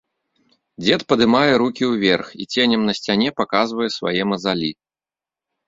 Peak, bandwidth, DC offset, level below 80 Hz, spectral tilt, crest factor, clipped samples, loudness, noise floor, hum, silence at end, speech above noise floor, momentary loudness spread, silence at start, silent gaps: -2 dBFS; 7.8 kHz; under 0.1%; -56 dBFS; -5 dB/octave; 18 dB; under 0.1%; -19 LUFS; under -90 dBFS; none; 0.95 s; over 72 dB; 7 LU; 0.8 s; none